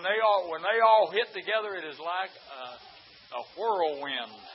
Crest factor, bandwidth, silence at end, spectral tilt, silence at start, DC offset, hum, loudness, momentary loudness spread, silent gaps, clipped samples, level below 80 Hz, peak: 18 dB; 5.8 kHz; 0 s; -6 dB/octave; 0 s; under 0.1%; none; -27 LUFS; 21 LU; none; under 0.1%; -80 dBFS; -10 dBFS